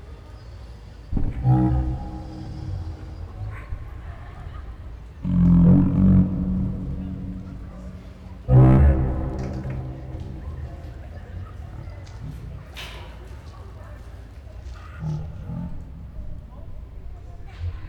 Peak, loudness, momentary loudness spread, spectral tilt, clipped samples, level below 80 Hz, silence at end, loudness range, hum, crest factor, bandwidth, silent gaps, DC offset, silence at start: -8 dBFS; -22 LUFS; 24 LU; -10 dB/octave; under 0.1%; -30 dBFS; 0 s; 17 LU; none; 16 dB; 6.2 kHz; none; under 0.1%; 0 s